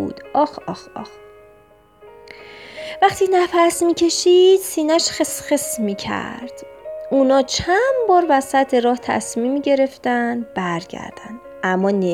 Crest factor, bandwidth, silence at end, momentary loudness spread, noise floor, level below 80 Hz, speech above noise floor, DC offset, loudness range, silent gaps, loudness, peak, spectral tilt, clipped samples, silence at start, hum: 16 dB; 16.5 kHz; 0 s; 19 LU; -50 dBFS; -52 dBFS; 33 dB; under 0.1%; 5 LU; none; -17 LUFS; -2 dBFS; -4 dB/octave; under 0.1%; 0 s; none